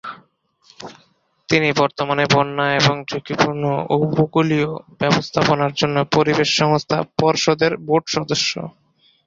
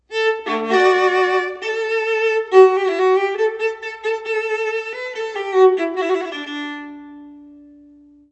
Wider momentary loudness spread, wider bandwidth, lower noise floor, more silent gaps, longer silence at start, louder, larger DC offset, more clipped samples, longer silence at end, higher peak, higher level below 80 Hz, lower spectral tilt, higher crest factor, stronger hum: second, 9 LU vs 13 LU; about the same, 7.8 kHz vs 8.4 kHz; first, -59 dBFS vs -47 dBFS; neither; about the same, 0.05 s vs 0.1 s; about the same, -18 LUFS vs -18 LUFS; neither; neither; second, 0.55 s vs 0.75 s; about the same, -2 dBFS vs 0 dBFS; first, -54 dBFS vs -66 dBFS; first, -5 dB/octave vs -3 dB/octave; about the same, 18 dB vs 18 dB; neither